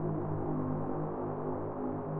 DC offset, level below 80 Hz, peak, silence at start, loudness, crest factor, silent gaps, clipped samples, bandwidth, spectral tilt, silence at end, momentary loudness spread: under 0.1%; -54 dBFS; -22 dBFS; 0 s; -36 LUFS; 12 dB; none; under 0.1%; 2.9 kHz; -13 dB/octave; 0 s; 2 LU